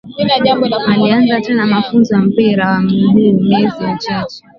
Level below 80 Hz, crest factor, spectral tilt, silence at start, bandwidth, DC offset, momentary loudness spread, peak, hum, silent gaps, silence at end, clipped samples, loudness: -48 dBFS; 12 dB; -7.5 dB/octave; 0.05 s; 6.6 kHz; under 0.1%; 7 LU; 0 dBFS; none; none; 0.2 s; under 0.1%; -12 LUFS